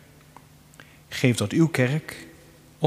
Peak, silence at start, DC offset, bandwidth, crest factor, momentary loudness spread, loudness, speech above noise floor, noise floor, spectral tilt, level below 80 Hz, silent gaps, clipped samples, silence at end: -4 dBFS; 1.1 s; under 0.1%; 15.5 kHz; 24 dB; 17 LU; -23 LUFS; 28 dB; -51 dBFS; -6 dB/octave; -60 dBFS; none; under 0.1%; 0 s